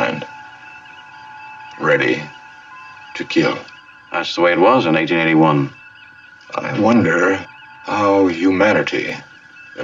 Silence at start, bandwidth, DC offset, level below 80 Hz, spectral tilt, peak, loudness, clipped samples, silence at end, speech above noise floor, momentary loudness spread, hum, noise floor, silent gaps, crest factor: 0 s; 7.6 kHz; under 0.1%; -64 dBFS; -6 dB/octave; -2 dBFS; -16 LUFS; under 0.1%; 0 s; 27 dB; 24 LU; none; -42 dBFS; none; 16 dB